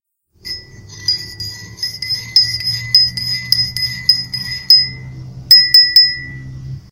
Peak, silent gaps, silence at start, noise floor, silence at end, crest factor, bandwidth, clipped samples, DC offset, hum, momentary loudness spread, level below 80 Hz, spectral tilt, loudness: 0 dBFS; none; 0.45 s; -36 dBFS; 0.1 s; 16 dB; 16.5 kHz; 0.2%; under 0.1%; none; 22 LU; -44 dBFS; -1 dB/octave; -11 LUFS